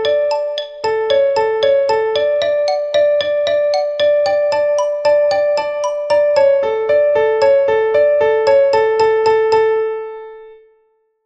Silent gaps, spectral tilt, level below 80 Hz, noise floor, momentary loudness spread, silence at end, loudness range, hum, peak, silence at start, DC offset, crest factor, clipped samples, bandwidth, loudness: none; -3 dB/octave; -56 dBFS; -59 dBFS; 7 LU; 0.7 s; 2 LU; none; -2 dBFS; 0 s; under 0.1%; 12 dB; under 0.1%; 8.4 kHz; -14 LUFS